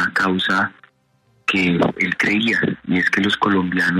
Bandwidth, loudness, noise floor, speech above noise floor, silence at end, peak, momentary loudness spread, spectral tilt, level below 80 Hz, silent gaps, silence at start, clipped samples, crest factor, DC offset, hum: 13 kHz; -18 LUFS; -61 dBFS; 42 dB; 0 s; -4 dBFS; 4 LU; -5.5 dB/octave; -56 dBFS; none; 0 s; under 0.1%; 14 dB; under 0.1%; none